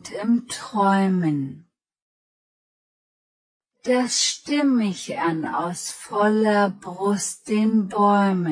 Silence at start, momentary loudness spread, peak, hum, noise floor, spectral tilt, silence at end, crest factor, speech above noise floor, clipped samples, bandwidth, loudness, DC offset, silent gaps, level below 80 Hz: 0.05 s; 9 LU; -8 dBFS; none; under -90 dBFS; -4.5 dB/octave; 0 s; 16 dB; over 69 dB; under 0.1%; 10.5 kHz; -22 LUFS; under 0.1%; 2.02-3.60 s; -70 dBFS